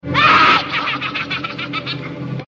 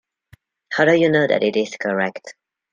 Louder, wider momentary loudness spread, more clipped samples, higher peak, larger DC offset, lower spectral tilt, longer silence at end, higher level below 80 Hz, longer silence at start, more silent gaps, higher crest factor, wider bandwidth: first, -15 LUFS vs -18 LUFS; first, 15 LU vs 11 LU; neither; about the same, -2 dBFS vs -2 dBFS; neither; second, -1.5 dB/octave vs -5.5 dB/octave; second, 0.05 s vs 0.4 s; first, -50 dBFS vs -64 dBFS; second, 0.05 s vs 0.7 s; neither; about the same, 16 dB vs 18 dB; about the same, 7.6 kHz vs 7.6 kHz